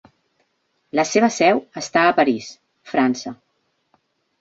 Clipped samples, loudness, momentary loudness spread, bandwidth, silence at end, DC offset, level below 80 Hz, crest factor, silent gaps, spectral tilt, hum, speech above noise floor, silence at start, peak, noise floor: under 0.1%; -19 LUFS; 12 LU; 8 kHz; 1.05 s; under 0.1%; -66 dBFS; 20 dB; none; -4 dB/octave; none; 51 dB; 0.95 s; -2 dBFS; -69 dBFS